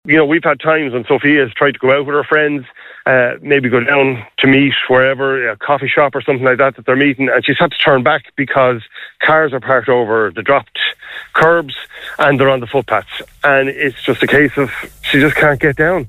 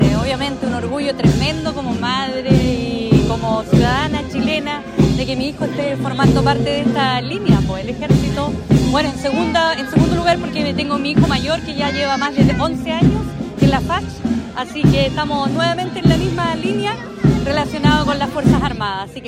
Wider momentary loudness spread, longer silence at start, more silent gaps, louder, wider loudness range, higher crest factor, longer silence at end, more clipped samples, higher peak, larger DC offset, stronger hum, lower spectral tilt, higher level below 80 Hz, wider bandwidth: about the same, 7 LU vs 6 LU; about the same, 0.05 s vs 0 s; neither; first, -13 LUFS vs -17 LUFS; about the same, 2 LU vs 1 LU; about the same, 12 dB vs 16 dB; about the same, 0 s vs 0 s; neither; about the same, 0 dBFS vs 0 dBFS; neither; neither; about the same, -6.5 dB/octave vs -6.5 dB/octave; second, -46 dBFS vs -32 dBFS; first, 15.5 kHz vs 14 kHz